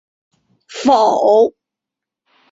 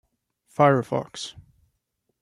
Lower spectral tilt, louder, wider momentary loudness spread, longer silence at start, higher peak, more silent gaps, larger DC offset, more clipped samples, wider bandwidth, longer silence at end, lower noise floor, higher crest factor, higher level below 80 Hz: second, -4 dB/octave vs -6 dB/octave; first, -13 LUFS vs -22 LUFS; second, 8 LU vs 18 LU; about the same, 0.7 s vs 0.6 s; first, -2 dBFS vs -6 dBFS; neither; neither; neither; second, 7.8 kHz vs 12 kHz; about the same, 1 s vs 0.9 s; first, -85 dBFS vs -76 dBFS; second, 16 dB vs 22 dB; about the same, -62 dBFS vs -64 dBFS